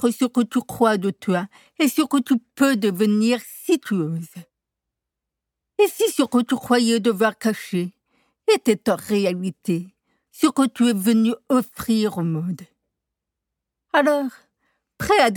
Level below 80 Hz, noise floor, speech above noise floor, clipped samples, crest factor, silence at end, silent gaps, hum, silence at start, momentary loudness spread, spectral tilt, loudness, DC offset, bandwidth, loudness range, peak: -60 dBFS; -84 dBFS; 64 dB; under 0.1%; 18 dB; 0 s; none; none; 0 s; 9 LU; -5 dB/octave; -21 LUFS; under 0.1%; 19 kHz; 3 LU; -4 dBFS